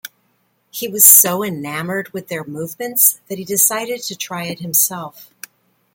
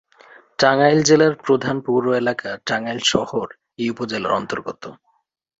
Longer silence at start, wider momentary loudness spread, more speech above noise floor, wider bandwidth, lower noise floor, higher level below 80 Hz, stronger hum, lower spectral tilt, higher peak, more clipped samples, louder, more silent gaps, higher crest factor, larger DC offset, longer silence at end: second, 0.05 s vs 0.6 s; first, 20 LU vs 16 LU; first, 46 dB vs 30 dB; first, 18 kHz vs 8 kHz; first, -63 dBFS vs -48 dBFS; second, -66 dBFS vs -60 dBFS; neither; second, -2 dB/octave vs -4 dB/octave; about the same, 0 dBFS vs -2 dBFS; first, 0.1% vs under 0.1%; first, -14 LUFS vs -19 LUFS; neither; about the same, 18 dB vs 18 dB; neither; about the same, 0.7 s vs 0.65 s